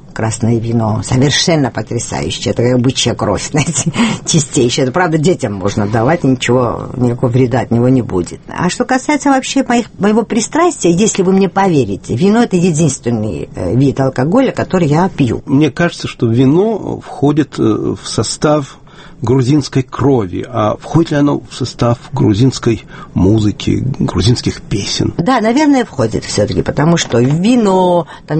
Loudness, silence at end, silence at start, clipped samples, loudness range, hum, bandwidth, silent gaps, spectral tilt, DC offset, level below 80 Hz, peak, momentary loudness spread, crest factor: -13 LUFS; 0 s; 0.05 s; under 0.1%; 2 LU; none; 8.8 kHz; none; -5.5 dB/octave; under 0.1%; -36 dBFS; 0 dBFS; 7 LU; 12 dB